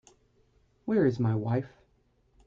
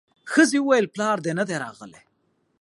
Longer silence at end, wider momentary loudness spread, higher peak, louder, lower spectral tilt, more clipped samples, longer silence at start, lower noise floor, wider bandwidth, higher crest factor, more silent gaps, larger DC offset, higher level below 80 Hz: about the same, 0.8 s vs 0.7 s; first, 15 LU vs 11 LU; second, -14 dBFS vs -4 dBFS; second, -28 LUFS vs -22 LUFS; first, -9.5 dB/octave vs -4.5 dB/octave; neither; first, 0.85 s vs 0.25 s; about the same, -68 dBFS vs -69 dBFS; second, 7.4 kHz vs 11.5 kHz; about the same, 18 dB vs 20 dB; neither; neither; first, -64 dBFS vs -74 dBFS